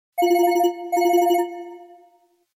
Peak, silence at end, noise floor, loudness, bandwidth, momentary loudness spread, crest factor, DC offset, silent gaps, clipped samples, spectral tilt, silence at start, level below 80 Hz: -8 dBFS; 0.75 s; -59 dBFS; -20 LUFS; 16.5 kHz; 15 LU; 14 dB; under 0.1%; none; under 0.1%; -2 dB/octave; 0.15 s; -78 dBFS